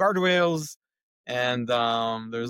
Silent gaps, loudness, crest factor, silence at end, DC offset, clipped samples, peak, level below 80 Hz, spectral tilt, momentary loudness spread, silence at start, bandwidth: 0.76-0.80 s, 1.03-1.24 s; -25 LUFS; 14 dB; 0 s; under 0.1%; under 0.1%; -12 dBFS; -70 dBFS; -4.5 dB/octave; 12 LU; 0 s; 17 kHz